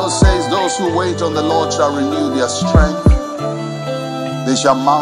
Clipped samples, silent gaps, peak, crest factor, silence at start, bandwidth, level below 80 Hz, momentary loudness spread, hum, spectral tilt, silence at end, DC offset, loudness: under 0.1%; none; 0 dBFS; 14 dB; 0 s; 11.5 kHz; -22 dBFS; 9 LU; none; -5 dB/octave; 0 s; under 0.1%; -16 LUFS